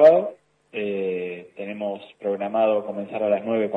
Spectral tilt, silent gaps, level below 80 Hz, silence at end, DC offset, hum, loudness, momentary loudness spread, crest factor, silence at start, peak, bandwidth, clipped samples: -8 dB/octave; none; -74 dBFS; 0 s; under 0.1%; none; -25 LUFS; 12 LU; 18 dB; 0 s; -4 dBFS; 4.9 kHz; under 0.1%